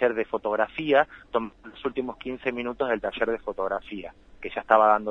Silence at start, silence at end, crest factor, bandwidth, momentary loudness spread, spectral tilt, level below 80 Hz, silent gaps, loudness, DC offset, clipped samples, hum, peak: 0 s; 0 s; 22 dB; 7 kHz; 15 LU; -6.5 dB/octave; -56 dBFS; none; -26 LUFS; under 0.1%; under 0.1%; none; -4 dBFS